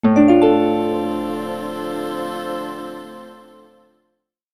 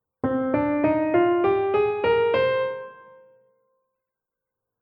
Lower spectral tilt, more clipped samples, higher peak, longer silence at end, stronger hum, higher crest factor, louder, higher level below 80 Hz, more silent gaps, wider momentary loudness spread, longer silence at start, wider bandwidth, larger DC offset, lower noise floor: second, -7 dB/octave vs -9.5 dB/octave; neither; first, -2 dBFS vs -10 dBFS; second, 1.15 s vs 1.85 s; neither; about the same, 18 dB vs 14 dB; first, -19 LUFS vs -22 LUFS; about the same, -56 dBFS vs -56 dBFS; neither; first, 20 LU vs 7 LU; second, 0.05 s vs 0.25 s; first, 13.5 kHz vs 5.2 kHz; neither; second, -72 dBFS vs -86 dBFS